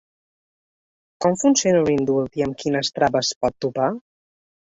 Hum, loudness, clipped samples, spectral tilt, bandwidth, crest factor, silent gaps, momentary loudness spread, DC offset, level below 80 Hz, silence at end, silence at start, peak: none; -21 LUFS; under 0.1%; -4 dB/octave; 8 kHz; 18 dB; 3.36-3.41 s; 7 LU; under 0.1%; -54 dBFS; 0.7 s; 1.2 s; -4 dBFS